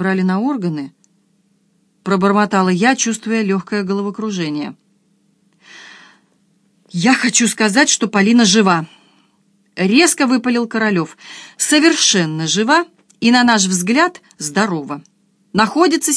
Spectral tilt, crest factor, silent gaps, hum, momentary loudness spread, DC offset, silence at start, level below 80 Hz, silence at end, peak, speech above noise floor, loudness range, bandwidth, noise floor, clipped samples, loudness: -3.5 dB/octave; 16 dB; none; none; 16 LU; under 0.1%; 0 s; -64 dBFS; 0 s; 0 dBFS; 45 dB; 8 LU; 11 kHz; -59 dBFS; under 0.1%; -15 LUFS